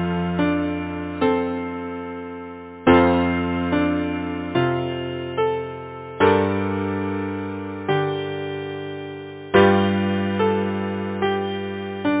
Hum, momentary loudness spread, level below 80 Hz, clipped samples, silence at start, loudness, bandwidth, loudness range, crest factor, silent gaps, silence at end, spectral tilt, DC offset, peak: none; 15 LU; -42 dBFS; under 0.1%; 0 s; -22 LUFS; 4 kHz; 2 LU; 20 dB; none; 0 s; -10.5 dB/octave; under 0.1%; -2 dBFS